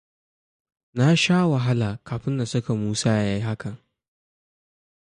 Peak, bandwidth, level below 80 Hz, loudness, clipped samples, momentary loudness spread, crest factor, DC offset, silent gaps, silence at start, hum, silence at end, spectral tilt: -8 dBFS; 11 kHz; -54 dBFS; -23 LUFS; under 0.1%; 12 LU; 16 dB; under 0.1%; none; 0.95 s; none; 1.3 s; -5.5 dB/octave